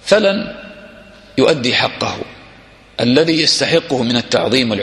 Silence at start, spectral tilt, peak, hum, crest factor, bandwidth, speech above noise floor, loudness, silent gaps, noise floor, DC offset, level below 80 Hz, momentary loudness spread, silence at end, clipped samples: 0.05 s; -4 dB/octave; 0 dBFS; none; 16 dB; 12 kHz; 28 dB; -14 LUFS; none; -43 dBFS; under 0.1%; -50 dBFS; 17 LU; 0 s; under 0.1%